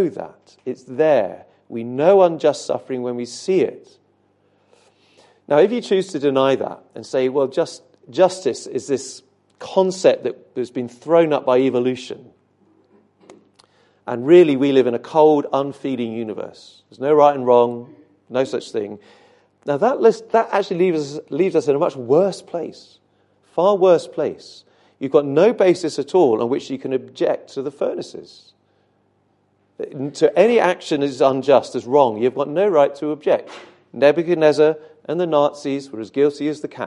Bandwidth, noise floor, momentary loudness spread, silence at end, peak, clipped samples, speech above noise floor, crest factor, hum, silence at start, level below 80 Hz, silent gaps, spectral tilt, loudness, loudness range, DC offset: 11 kHz; -63 dBFS; 15 LU; 0 s; 0 dBFS; under 0.1%; 45 dB; 18 dB; 50 Hz at -60 dBFS; 0 s; -72 dBFS; none; -6 dB/octave; -18 LUFS; 5 LU; under 0.1%